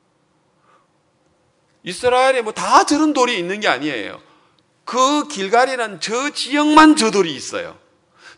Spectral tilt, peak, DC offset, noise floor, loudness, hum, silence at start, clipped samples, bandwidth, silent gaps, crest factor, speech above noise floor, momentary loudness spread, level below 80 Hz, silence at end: -3 dB/octave; 0 dBFS; under 0.1%; -61 dBFS; -16 LUFS; none; 1.85 s; 0.1%; 11 kHz; none; 18 dB; 45 dB; 16 LU; -56 dBFS; 0.1 s